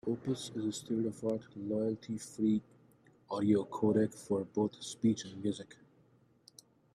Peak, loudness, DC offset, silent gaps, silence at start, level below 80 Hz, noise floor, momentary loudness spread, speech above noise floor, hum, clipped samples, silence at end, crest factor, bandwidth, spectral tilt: -16 dBFS; -35 LUFS; under 0.1%; none; 0.05 s; -74 dBFS; -67 dBFS; 9 LU; 33 dB; none; under 0.1%; 1.2 s; 18 dB; 13 kHz; -6.5 dB/octave